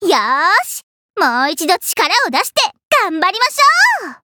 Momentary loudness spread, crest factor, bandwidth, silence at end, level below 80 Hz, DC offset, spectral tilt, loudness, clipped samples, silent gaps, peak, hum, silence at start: 6 LU; 14 dB; over 20 kHz; 0.1 s; -68 dBFS; under 0.1%; 0 dB/octave; -13 LUFS; under 0.1%; 0.83-1.14 s, 2.85-2.91 s; 0 dBFS; none; 0 s